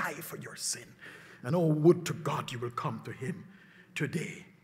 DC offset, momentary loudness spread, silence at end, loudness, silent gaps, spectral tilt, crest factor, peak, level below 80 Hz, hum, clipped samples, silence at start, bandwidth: under 0.1%; 18 LU; 0.2 s; -32 LUFS; none; -5.5 dB/octave; 22 dB; -12 dBFS; -74 dBFS; none; under 0.1%; 0 s; 16 kHz